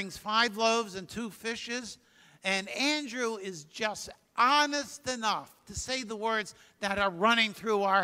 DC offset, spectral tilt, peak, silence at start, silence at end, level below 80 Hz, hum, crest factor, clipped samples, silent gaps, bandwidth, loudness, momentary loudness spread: under 0.1%; -2.5 dB/octave; -10 dBFS; 0 s; 0 s; -62 dBFS; none; 20 dB; under 0.1%; none; 16 kHz; -30 LUFS; 14 LU